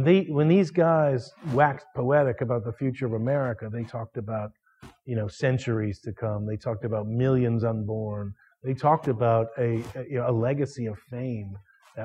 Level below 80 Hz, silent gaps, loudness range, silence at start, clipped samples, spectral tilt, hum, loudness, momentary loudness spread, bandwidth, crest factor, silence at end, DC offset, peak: -60 dBFS; none; 6 LU; 0 s; under 0.1%; -8.5 dB/octave; none; -26 LUFS; 13 LU; 8.8 kHz; 20 dB; 0 s; under 0.1%; -6 dBFS